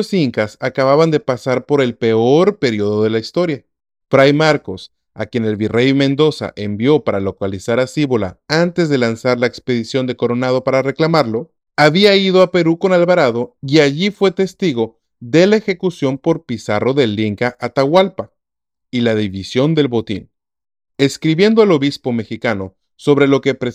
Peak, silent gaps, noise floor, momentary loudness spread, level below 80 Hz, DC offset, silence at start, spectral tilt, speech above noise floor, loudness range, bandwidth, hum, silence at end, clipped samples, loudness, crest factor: 0 dBFS; none; -83 dBFS; 9 LU; -56 dBFS; under 0.1%; 0 s; -6 dB/octave; 68 dB; 4 LU; 13 kHz; none; 0 s; under 0.1%; -15 LUFS; 14 dB